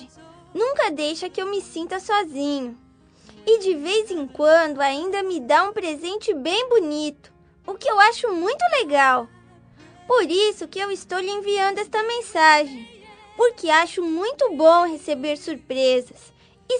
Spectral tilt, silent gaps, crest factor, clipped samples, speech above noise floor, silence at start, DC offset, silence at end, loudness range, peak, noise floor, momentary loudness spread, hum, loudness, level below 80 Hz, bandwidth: -2.5 dB/octave; none; 20 dB; under 0.1%; 31 dB; 0 s; under 0.1%; 0 s; 5 LU; 0 dBFS; -51 dBFS; 13 LU; none; -21 LUFS; -64 dBFS; 10 kHz